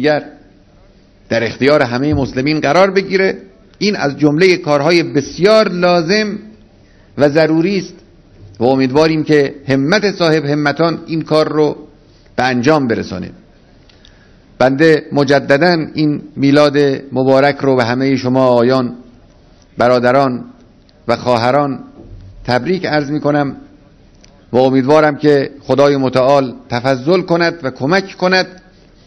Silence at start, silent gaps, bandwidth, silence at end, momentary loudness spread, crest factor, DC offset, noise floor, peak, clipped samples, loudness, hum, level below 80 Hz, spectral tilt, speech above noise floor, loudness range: 0 s; none; 11 kHz; 0.5 s; 9 LU; 14 dB; under 0.1%; -45 dBFS; 0 dBFS; 0.3%; -13 LUFS; none; -46 dBFS; -6 dB/octave; 33 dB; 4 LU